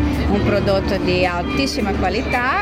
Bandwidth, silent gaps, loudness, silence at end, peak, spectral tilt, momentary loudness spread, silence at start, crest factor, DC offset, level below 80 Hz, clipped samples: 16 kHz; none; -18 LUFS; 0 s; -4 dBFS; -6 dB/octave; 2 LU; 0 s; 14 dB; under 0.1%; -28 dBFS; under 0.1%